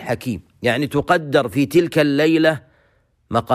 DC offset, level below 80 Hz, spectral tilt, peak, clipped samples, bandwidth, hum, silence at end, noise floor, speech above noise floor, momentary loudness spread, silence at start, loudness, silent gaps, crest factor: under 0.1%; -50 dBFS; -6 dB/octave; -4 dBFS; under 0.1%; 15.5 kHz; none; 0 s; -60 dBFS; 43 dB; 9 LU; 0 s; -18 LUFS; none; 14 dB